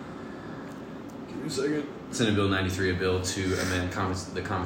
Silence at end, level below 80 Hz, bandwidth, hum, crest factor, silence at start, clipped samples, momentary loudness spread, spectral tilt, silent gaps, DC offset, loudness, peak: 0 s; -58 dBFS; 16 kHz; none; 16 dB; 0 s; under 0.1%; 14 LU; -5 dB/octave; none; under 0.1%; -29 LUFS; -12 dBFS